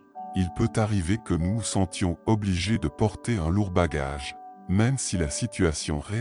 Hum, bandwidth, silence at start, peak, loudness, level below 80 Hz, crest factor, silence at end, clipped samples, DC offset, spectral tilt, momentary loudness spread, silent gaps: none; 11 kHz; 0.15 s; -10 dBFS; -26 LUFS; -40 dBFS; 16 dB; 0 s; under 0.1%; under 0.1%; -5.5 dB/octave; 5 LU; none